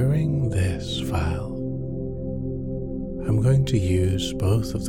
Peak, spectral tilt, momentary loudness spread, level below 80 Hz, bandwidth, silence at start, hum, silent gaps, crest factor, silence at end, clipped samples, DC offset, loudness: -10 dBFS; -7 dB/octave; 10 LU; -36 dBFS; 15.5 kHz; 0 s; none; none; 14 dB; 0 s; under 0.1%; under 0.1%; -25 LUFS